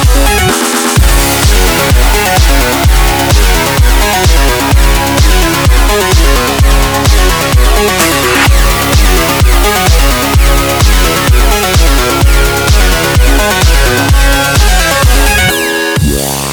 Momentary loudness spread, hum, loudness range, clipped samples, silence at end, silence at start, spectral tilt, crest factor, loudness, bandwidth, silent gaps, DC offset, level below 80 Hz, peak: 1 LU; none; 0 LU; 0.4%; 0 s; 0 s; -3.5 dB/octave; 6 dB; -8 LUFS; over 20 kHz; none; under 0.1%; -10 dBFS; 0 dBFS